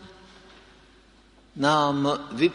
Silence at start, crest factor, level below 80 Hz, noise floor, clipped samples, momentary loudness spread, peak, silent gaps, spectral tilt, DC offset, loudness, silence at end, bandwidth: 0 s; 20 dB; -60 dBFS; -56 dBFS; under 0.1%; 7 LU; -6 dBFS; none; -5.5 dB/octave; under 0.1%; -24 LUFS; 0 s; 10.5 kHz